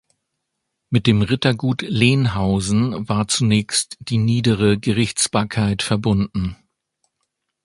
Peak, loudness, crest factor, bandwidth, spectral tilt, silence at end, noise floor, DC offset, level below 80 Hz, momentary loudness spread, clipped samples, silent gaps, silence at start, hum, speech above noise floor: 0 dBFS; -19 LUFS; 18 dB; 11.5 kHz; -5 dB/octave; 1.1 s; -77 dBFS; under 0.1%; -42 dBFS; 5 LU; under 0.1%; none; 0.9 s; none; 59 dB